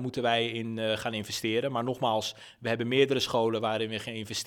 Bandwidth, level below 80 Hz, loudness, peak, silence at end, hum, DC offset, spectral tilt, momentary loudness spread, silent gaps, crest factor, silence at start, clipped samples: 18.5 kHz; -68 dBFS; -29 LUFS; -8 dBFS; 0 s; none; under 0.1%; -4.5 dB/octave; 8 LU; none; 20 dB; 0 s; under 0.1%